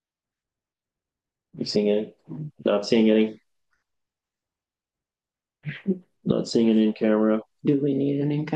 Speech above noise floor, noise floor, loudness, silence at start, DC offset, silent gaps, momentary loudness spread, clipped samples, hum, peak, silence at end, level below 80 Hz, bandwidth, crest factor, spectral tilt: over 68 dB; under -90 dBFS; -23 LUFS; 1.55 s; under 0.1%; none; 14 LU; under 0.1%; none; -6 dBFS; 0 s; -68 dBFS; 8.8 kHz; 18 dB; -7 dB/octave